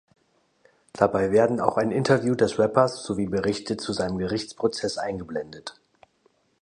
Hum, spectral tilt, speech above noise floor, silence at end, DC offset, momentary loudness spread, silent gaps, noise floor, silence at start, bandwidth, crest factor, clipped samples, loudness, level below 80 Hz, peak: none; -5.5 dB/octave; 42 dB; 0.9 s; under 0.1%; 12 LU; none; -66 dBFS; 0.95 s; 10.5 kHz; 22 dB; under 0.1%; -24 LUFS; -54 dBFS; -2 dBFS